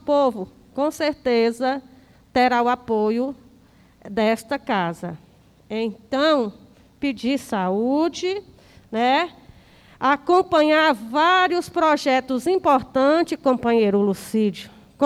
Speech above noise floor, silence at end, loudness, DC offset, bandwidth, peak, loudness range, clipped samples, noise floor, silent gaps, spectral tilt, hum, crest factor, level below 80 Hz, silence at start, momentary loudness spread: 33 dB; 0 s; -21 LUFS; under 0.1%; 14.5 kHz; -6 dBFS; 6 LU; under 0.1%; -53 dBFS; none; -5 dB/octave; none; 16 dB; -58 dBFS; 0.05 s; 12 LU